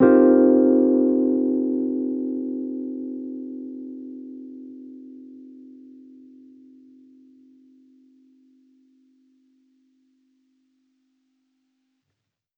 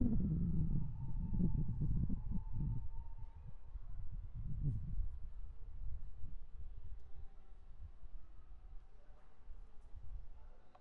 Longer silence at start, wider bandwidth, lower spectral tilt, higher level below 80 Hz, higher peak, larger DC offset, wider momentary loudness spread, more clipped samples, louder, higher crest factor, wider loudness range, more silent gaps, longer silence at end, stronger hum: about the same, 0 s vs 0 s; first, 2.8 kHz vs 1.9 kHz; about the same, -11.5 dB/octave vs -12.5 dB/octave; second, -68 dBFS vs -46 dBFS; first, -4 dBFS vs -20 dBFS; neither; first, 27 LU vs 23 LU; neither; first, -20 LUFS vs -44 LUFS; about the same, 20 dB vs 18 dB; first, 26 LU vs 19 LU; neither; first, 7.05 s vs 0.05 s; neither